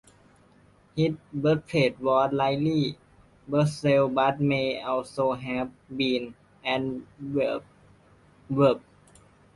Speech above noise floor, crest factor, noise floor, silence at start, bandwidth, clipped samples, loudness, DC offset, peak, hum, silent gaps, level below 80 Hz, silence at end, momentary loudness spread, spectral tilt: 33 dB; 18 dB; -58 dBFS; 0.95 s; 11.5 kHz; under 0.1%; -26 LUFS; under 0.1%; -10 dBFS; 50 Hz at -45 dBFS; none; -60 dBFS; 0.75 s; 11 LU; -7 dB/octave